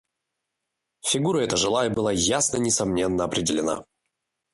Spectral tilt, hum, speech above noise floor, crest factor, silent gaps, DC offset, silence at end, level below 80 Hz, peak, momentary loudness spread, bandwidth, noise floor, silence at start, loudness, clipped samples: -3.5 dB/octave; none; 59 dB; 18 dB; none; under 0.1%; 0.7 s; -52 dBFS; -8 dBFS; 5 LU; 11.5 kHz; -82 dBFS; 1.05 s; -23 LUFS; under 0.1%